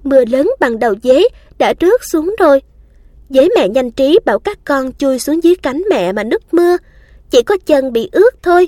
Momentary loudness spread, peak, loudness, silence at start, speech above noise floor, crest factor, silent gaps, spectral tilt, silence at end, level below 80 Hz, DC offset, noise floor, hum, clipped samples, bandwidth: 6 LU; 0 dBFS; -12 LUFS; 0.05 s; 30 dB; 12 dB; none; -4.5 dB/octave; 0 s; -42 dBFS; under 0.1%; -42 dBFS; none; under 0.1%; 16 kHz